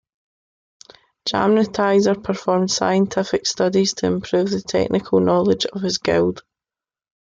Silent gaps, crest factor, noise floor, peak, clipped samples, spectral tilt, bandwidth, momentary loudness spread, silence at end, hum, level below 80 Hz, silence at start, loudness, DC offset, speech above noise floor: none; 14 dB; under -90 dBFS; -4 dBFS; under 0.1%; -5 dB/octave; 9 kHz; 5 LU; 0.85 s; none; -54 dBFS; 1.25 s; -19 LUFS; under 0.1%; over 72 dB